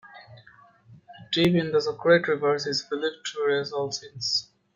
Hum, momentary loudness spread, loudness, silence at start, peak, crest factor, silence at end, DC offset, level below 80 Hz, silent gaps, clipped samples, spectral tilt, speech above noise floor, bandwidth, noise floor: none; 9 LU; -25 LUFS; 0.05 s; -6 dBFS; 22 dB; 0.3 s; under 0.1%; -64 dBFS; none; under 0.1%; -4.5 dB/octave; 30 dB; 13 kHz; -55 dBFS